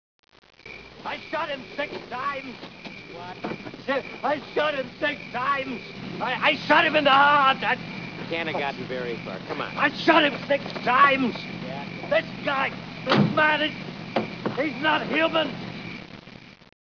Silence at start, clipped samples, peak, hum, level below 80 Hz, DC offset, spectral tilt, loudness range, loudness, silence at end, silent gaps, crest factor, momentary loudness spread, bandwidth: 0.65 s; under 0.1%; -4 dBFS; none; -60 dBFS; under 0.1%; -5.5 dB/octave; 10 LU; -24 LUFS; 0.4 s; none; 22 dB; 17 LU; 5.4 kHz